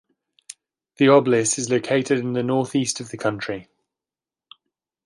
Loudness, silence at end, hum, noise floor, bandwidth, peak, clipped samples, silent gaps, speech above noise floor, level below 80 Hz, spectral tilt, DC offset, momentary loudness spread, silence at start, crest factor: -21 LUFS; 1.45 s; none; under -90 dBFS; 11.5 kHz; -4 dBFS; under 0.1%; none; over 70 dB; -64 dBFS; -4.5 dB/octave; under 0.1%; 18 LU; 1 s; 20 dB